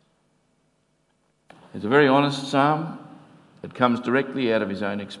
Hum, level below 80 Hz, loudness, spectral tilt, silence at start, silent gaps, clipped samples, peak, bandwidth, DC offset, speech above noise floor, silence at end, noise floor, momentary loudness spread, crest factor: none; -72 dBFS; -22 LUFS; -6 dB/octave; 1.75 s; none; under 0.1%; -2 dBFS; 11.5 kHz; under 0.1%; 46 dB; 0 s; -68 dBFS; 22 LU; 22 dB